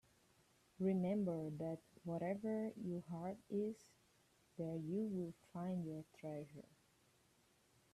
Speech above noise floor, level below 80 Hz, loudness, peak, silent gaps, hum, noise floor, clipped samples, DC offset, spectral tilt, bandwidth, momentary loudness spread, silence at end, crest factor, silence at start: 31 dB; -80 dBFS; -45 LUFS; -30 dBFS; none; none; -75 dBFS; under 0.1%; under 0.1%; -9 dB/octave; 13 kHz; 11 LU; 1.35 s; 16 dB; 0.8 s